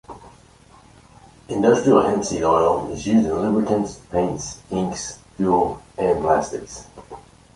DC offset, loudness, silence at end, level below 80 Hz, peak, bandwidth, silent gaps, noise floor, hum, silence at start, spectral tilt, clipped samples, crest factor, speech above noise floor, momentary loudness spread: under 0.1%; -20 LUFS; 0.35 s; -46 dBFS; -2 dBFS; 11.5 kHz; none; -50 dBFS; none; 0.1 s; -6 dB/octave; under 0.1%; 20 dB; 30 dB; 16 LU